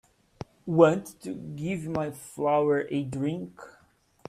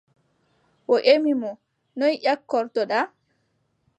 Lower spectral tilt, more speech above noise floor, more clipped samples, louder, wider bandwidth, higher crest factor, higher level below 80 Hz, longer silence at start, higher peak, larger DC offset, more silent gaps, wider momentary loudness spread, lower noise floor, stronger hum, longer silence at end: first, -7 dB/octave vs -4.5 dB/octave; second, 37 dB vs 49 dB; neither; second, -27 LUFS vs -22 LUFS; first, 15 kHz vs 8.4 kHz; about the same, 24 dB vs 22 dB; first, -62 dBFS vs -82 dBFS; second, 0.65 s vs 0.9 s; about the same, -4 dBFS vs -2 dBFS; neither; neither; first, 19 LU vs 15 LU; second, -63 dBFS vs -70 dBFS; neither; second, 0.6 s vs 0.9 s